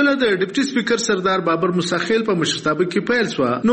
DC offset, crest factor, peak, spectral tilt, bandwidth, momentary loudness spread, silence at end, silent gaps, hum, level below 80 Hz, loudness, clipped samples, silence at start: under 0.1%; 14 dB; -4 dBFS; -4.5 dB/octave; 8.8 kHz; 2 LU; 0 s; none; none; -56 dBFS; -19 LUFS; under 0.1%; 0 s